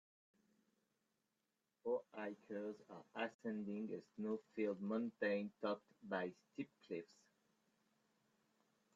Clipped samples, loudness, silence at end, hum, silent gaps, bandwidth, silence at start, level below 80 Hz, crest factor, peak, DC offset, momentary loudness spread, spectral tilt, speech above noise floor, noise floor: under 0.1%; -46 LUFS; 1.9 s; none; 3.34-3.39 s; 7.6 kHz; 1.85 s; under -90 dBFS; 20 dB; -28 dBFS; under 0.1%; 10 LU; -5 dB/octave; 43 dB; -89 dBFS